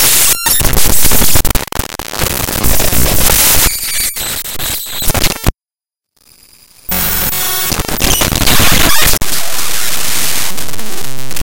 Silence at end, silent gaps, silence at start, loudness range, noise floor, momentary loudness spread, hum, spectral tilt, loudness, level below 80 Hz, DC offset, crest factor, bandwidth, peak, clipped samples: 0 s; none; 0 s; 5 LU; under -90 dBFS; 12 LU; none; -2 dB/octave; -11 LUFS; -22 dBFS; under 0.1%; 12 dB; over 20 kHz; 0 dBFS; 0.7%